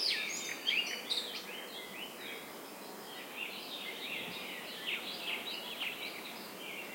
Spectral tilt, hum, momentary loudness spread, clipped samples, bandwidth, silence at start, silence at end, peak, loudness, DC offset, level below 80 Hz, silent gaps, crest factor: -0.5 dB/octave; none; 12 LU; under 0.1%; 16.5 kHz; 0 s; 0 s; -20 dBFS; -39 LUFS; under 0.1%; -84 dBFS; none; 22 dB